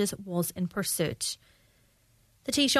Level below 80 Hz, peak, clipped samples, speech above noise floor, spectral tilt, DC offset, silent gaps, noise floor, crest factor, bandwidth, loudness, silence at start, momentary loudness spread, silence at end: -62 dBFS; -10 dBFS; under 0.1%; 36 dB; -3.5 dB/octave; under 0.1%; none; -65 dBFS; 22 dB; 14 kHz; -31 LUFS; 0 s; 8 LU; 0 s